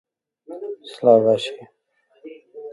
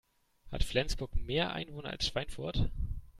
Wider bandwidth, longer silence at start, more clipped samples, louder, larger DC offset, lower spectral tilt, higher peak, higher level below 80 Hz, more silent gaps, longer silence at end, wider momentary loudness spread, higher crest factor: second, 11.5 kHz vs 13 kHz; about the same, 0.5 s vs 0.45 s; neither; first, -18 LUFS vs -36 LUFS; neither; first, -6 dB/octave vs -4.5 dB/octave; first, -2 dBFS vs -14 dBFS; second, -72 dBFS vs -40 dBFS; neither; about the same, 0 s vs 0 s; first, 25 LU vs 8 LU; about the same, 20 dB vs 20 dB